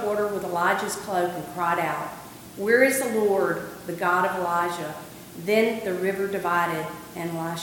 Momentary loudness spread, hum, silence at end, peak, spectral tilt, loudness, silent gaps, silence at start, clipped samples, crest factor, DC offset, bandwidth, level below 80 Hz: 13 LU; none; 0 s; -6 dBFS; -4.5 dB/octave; -25 LUFS; none; 0 s; under 0.1%; 20 dB; under 0.1%; 17.5 kHz; -62 dBFS